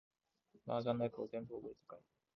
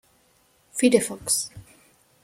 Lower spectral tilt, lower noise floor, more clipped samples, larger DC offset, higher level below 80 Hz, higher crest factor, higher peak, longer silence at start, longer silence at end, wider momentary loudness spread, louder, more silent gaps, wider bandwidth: first, -6.5 dB/octave vs -3 dB/octave; first, -74 dBFS vs -62 dBFS; neither; neither; second, -78 dBFS vs -62 dBFS; about the same, 22 dB vs 22 dB; second, -22 dBFS vs -4 dBFS; about the same, 0.65 s vs 0.75 s; second, 0.35 s vs 0.6 s; first, 20 LU vs 14 LU; second, -42 LUFS vs -23 LUFS; neither; second, 6.2 kHz vs 16.5 kHz